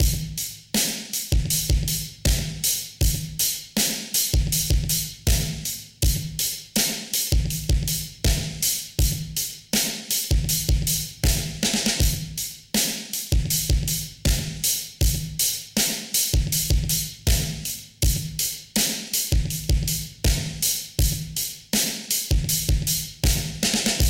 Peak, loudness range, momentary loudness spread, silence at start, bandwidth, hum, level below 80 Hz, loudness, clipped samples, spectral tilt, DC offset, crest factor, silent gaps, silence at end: -6 dBFS; 1 LU; 4 LU; 0 s; 17 kHz; none; -28 dBFS; -23 LUFS; under 0.1%; -3 dB/octave; under 0.1%; 18 dB; none; 0 s